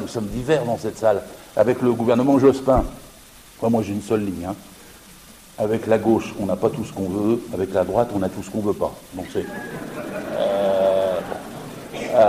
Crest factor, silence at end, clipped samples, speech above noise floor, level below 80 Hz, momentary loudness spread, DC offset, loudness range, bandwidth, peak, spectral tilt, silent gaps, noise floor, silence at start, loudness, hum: 16 dB; 0 s; under 0.1%; 24 dB; -42 dBFS; 13 LU; under 0.1%; 5 LU; 15.5 kHz; -4 dBFS; -6.5 dB/octave; none; -45 dBFS; 0 s; -22 LUFS; none